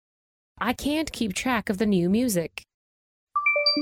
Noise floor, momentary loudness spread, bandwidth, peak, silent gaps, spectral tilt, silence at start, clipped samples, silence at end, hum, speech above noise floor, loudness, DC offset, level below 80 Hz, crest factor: under -90 dBFS; 9 LU; 17.5 kHz; -10 dBFS; 2.74-3.27 s; -4 dB/octave; 0.6 s; under 0.1%; 0 s; none; over 65 dB; -25 LUFS; under 0.1%; -52 dBFS; 16 dB